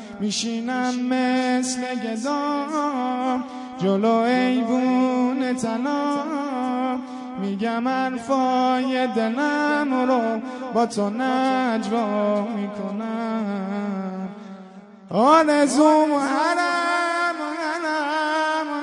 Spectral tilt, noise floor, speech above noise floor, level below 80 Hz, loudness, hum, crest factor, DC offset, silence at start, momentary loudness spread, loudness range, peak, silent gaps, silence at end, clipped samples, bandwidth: -4.5 dB/octave; -43 dBFS; 22 dB; -70 dBFS; -22 LUFS; none; 18 dB; under 0.1%; 0 s; 9 LU; 5 LU; -4 dBFS; none; 0 s; under 0.1%; 11 kHz